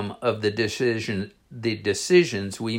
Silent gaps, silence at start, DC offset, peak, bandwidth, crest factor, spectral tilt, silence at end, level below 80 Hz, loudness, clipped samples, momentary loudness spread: none; 0 s; under 0.1%; -6 dBFS; 16 kHz; 18 dB; -5 dB/octave; 0 s; -64 dBFS; -24 LUFS; under 0.1%; 11 LU